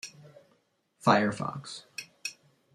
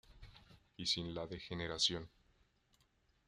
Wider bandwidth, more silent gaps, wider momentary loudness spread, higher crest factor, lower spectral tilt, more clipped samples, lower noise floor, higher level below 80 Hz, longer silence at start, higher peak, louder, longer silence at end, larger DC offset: first, 15 kHz vs 12.5 kHz; neither; first, 17 LU vs 11 LU; about the same, 26 dB vs 22 dB; first, -5 dB/octave vs -3 dB/octave; neither; second, -71 dBFS vs -76 dBFS; about the same, -70 dBFS vs -66 dBFS; about the same, 0.05 s vs 0.1 s; first, -6 dBFS vs -22 dBFS; first, -30 LUFS vs -39 LUFS; second, 0.45 s vs 1.2 s; neither